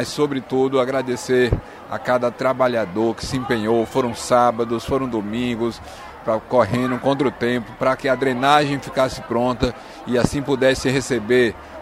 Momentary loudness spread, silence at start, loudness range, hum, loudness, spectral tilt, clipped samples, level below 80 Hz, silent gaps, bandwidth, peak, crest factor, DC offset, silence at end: 7 LU; 0 s; 2 LU; none; -20 LUFS; -5.5 dB/octave; under 0.1%; -40 dBFS; none; 15 kHz; 0 dBFS; 20 dB; under 0.1%; 0 s